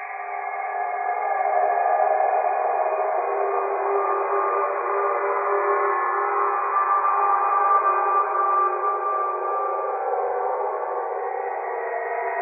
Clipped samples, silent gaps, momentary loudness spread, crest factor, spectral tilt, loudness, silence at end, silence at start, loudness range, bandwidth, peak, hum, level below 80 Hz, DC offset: under 0.1%; none; 7 LU; 14 dB; -2.5 dB/octave; -23 LUFS; 0 s; 0 s; 4 LU; 2.7 kHz; -8 dBFS; none; under -90 dBFS; under 0.1%